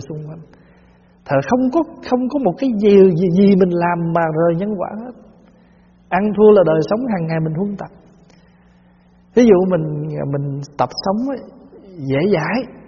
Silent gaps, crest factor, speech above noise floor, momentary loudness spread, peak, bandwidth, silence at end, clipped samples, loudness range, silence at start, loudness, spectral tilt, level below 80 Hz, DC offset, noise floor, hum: none; 16 dB; 35 dB; 15 LU; 0 dBFS; 7 kHz; 0.1 s; under 0.1%; 4 LU; 0 s; -16 LUFS; -7 dB/octave; -50 dBFS; under 0.1%; -50 dBFS; none